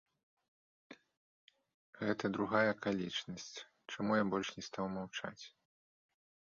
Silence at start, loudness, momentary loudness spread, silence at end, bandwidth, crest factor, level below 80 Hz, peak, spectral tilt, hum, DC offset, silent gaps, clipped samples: 0.9 s; -38 LUFS; 16 LU; 1 s; 7.4 kHz; 22 dB; -74 dBFS; -18 dBFS; -3.5 dB/octave; none; under 0.1%; 1.17-1.48 s, 1.74-1.93 s; under 0.1%